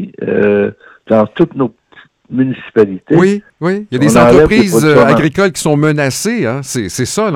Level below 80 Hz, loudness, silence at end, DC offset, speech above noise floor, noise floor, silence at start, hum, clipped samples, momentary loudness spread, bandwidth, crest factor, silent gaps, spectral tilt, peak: -38 dBFS; -11 LUFS; 0 s; under 0.1%; 33 dB; -44 dBFS; 0 s; none; 0.4%; 10 LU; 17 kHz; 12 dB; none; -5.5 dB/octave; 0 dBFS